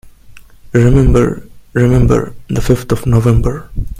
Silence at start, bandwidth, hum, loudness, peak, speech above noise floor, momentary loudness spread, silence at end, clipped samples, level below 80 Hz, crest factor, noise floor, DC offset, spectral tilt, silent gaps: 0.05 s; 15.5 kHz; none; -13 LUFS; 0 dBFS; 26 dB; 10 LU; 0 s; 0.2%; -20 dBFS; 12 dB; -37 dBFS; under 0.1%; -8 dB/octave; none